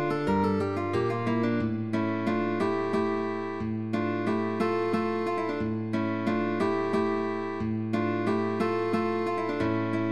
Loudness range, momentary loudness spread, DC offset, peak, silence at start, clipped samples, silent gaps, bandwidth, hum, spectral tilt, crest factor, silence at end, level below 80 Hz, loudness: 1 LU; 4 LU; 0.3%; -14 dBFS; 0 s; under 0.1%; none; 11.5 kHz; none; -8 dB/octave; 14 dB; 0 s; -58 dBFS; -28 LUFS